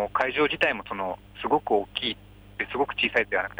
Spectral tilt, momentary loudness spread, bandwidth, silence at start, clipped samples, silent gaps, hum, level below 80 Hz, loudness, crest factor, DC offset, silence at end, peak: -5 dB/octave; 11 LU; over 20 kHz; 0 s; under 0.1%; none; 50 Hz at -50 dBFS; -54 dBFS; -26 LUFS; 18 dB; under 0.1%; 0.05 s; -10 dBFS